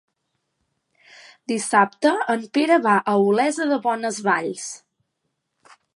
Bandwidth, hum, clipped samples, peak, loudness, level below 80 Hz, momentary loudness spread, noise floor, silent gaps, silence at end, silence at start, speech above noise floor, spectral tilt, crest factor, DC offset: 11.5 kHz; none; under 0.1%; -2 dBFS; -20 LUFS; -78 dBFS; 13 LU; -76 dBFS; none; 1.2 s; 1.5 s; 56 dB; -4 dB/octave; 20 dB; under 0.1%